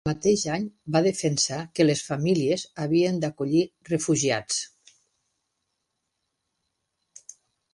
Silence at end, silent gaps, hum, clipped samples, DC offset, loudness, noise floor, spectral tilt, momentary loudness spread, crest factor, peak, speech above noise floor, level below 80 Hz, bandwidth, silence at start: 3.1 s; none; none; under 0.1%; under 0.1%; -25 LUFS; -79 dBFS; -4.5 dB/octave; 6 LU; 20 dB; -8 dBFS; 55 dB; -60 dBFS; 11.5 kHz; 0.05 s